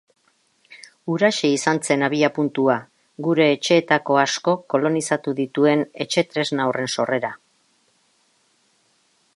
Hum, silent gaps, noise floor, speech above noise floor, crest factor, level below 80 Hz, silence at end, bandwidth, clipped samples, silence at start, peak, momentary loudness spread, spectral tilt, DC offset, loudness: none; none; -63 dBFS; 43 dB; 20 dB; -72 dBFS; 2 s; 11.5 kHz; under 0.1%; 0.7 s; -2 dBFS; 6 LU; -4.5 dB/octave; under 0.1%; -20 LUFS